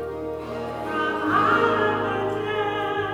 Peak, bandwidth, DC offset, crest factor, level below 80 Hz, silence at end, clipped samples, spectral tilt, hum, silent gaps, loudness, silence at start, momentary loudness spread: -8 dBFS; 16.5 kHz; under 0.1%; 16 dB; -54 dBFS; 0 s; under 0.1%; -6 dB/octave; none; none; -23 LUFS; 0 s; 12 LU